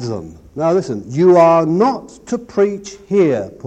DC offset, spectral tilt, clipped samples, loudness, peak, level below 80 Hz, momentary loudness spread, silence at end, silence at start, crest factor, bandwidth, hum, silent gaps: under 0.1%; -7.5 dB/octave; under 0.1%; -15 LUFS; 0 dBFS; -50 dBFS; 17 LU; 0 s; 0 s; 14 dB; 8.6 kHz; none; none